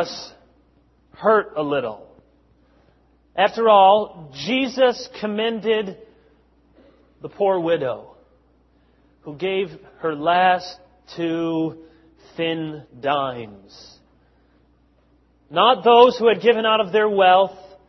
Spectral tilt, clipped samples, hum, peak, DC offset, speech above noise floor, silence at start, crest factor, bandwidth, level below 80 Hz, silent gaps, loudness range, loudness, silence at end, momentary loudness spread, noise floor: -5 dB/octave; under 0.1%; none; -2 dBFS; under 0.1%; 39 dB; 0 s; 20 dB; 6.2 kHz; -62 dBFS; none; 9 LU; -19 LUFS; 0.2 s; 20 LU; -58 dBFS